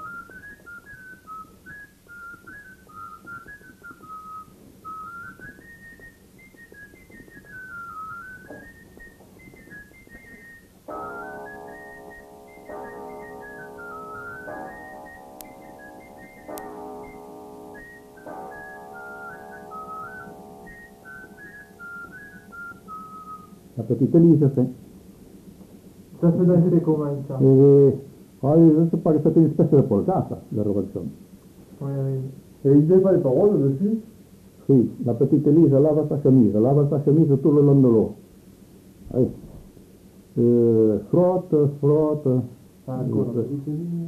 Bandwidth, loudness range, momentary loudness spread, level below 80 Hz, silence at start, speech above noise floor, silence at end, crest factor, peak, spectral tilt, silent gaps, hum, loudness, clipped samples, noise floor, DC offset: 14 kHz; 23 LU; 26 LU; -56 dBFS; 0 s; 32 dB; 0 s; 18 dB; -4 dBFS; -10.5 dB/octave; none; none; -19 LUFS; under 0.1%; -50 dBFS; under 0.1%